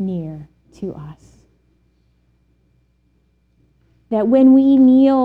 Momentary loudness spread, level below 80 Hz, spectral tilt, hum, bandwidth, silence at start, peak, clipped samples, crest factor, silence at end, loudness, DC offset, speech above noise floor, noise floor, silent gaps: 25 LU; -54 dBFS; -9.5 dB/octave; none; 4.5 kHz; 0 s; -4 dBFS; under 0.1%; 14 dB; 0 s; -13 LUFS; under 0.1%; 47 dB; -60 dBFS; none